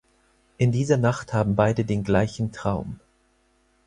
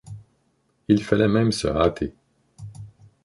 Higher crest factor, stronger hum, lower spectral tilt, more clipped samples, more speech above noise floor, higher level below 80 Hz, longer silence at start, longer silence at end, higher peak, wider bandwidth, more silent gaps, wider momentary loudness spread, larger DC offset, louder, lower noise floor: about the same, 20 dB vs 20 dB; neither; about the same, -7 dB/octave vs -6.5 dB/octave; neither; second, 42 dB vs 47 dB; about the same, -48 dBFS vs -44 dBFS; first, 0.6 s vs 0.05 s; first, 0.9 s vs 0.35 s; about the same, -4 dBFS vs -4 dBFS; about the same, 10.5 kHz vs 11.5 kHz; neither; second, 8 LU vs 24 LU; neither; about the same, -24 LUFS vs -22 LUFS; about the same, -64 dBFS vs -67 dBFS